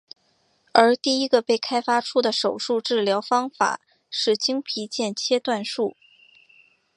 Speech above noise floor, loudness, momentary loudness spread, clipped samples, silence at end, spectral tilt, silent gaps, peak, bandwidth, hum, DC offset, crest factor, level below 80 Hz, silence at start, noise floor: 43 dB; -22 LUFS; 9 LU; under 0.1%; 1.05 s; -3 dB/octave; none; 0 dBFS; 11 kHz; none; under 0.1%; 22 dB; -74 dBFS; 0.75 s; -66 dBFS